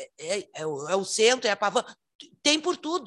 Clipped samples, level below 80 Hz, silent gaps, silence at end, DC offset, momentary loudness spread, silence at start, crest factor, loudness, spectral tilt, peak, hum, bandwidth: under 0.1%; -76 dBFS; 2.15-2.19 s; 0 s; under 0.1%; 11 LU; 0 s; 20 dB; -25 LUFS; -2 dB/octave; -6 dBFS; none; 12.5 kHz